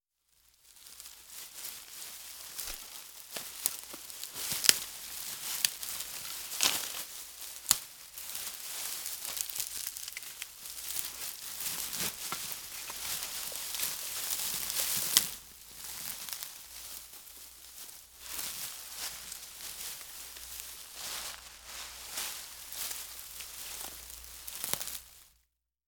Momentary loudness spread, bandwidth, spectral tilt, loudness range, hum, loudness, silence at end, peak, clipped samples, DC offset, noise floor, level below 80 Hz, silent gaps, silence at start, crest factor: 15 LU; over 20 kHz; 1 dB/octave; 9 LU; none; -35 LUFS; 0.6 s; 0 dBFS; under 0.1%; under 0.1%; -77 dBFS; -66 dBFS; none; 0.65 s; 38 dB